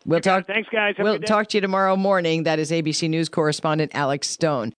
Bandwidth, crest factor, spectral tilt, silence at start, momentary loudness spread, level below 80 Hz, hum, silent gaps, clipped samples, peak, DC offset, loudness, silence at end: 10 kHz; 16 dB; -4.5 dB/octave; 0.05 s; 3 LU; -68 dBFS; none; none; under 0.1%; -6 dBFS; under 0.1%; -21 LUFS; 0.1 s